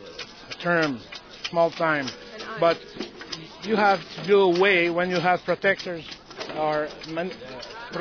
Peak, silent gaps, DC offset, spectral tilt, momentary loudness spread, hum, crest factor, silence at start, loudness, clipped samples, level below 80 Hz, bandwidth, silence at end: -6 dBFS; none; under 0.1%; -5 dB/octave; 17 LU; none; 18 dB; 0 s; -24 LUFS; under 0.1%; -60 dBFS; 5.4 kHz; 0 s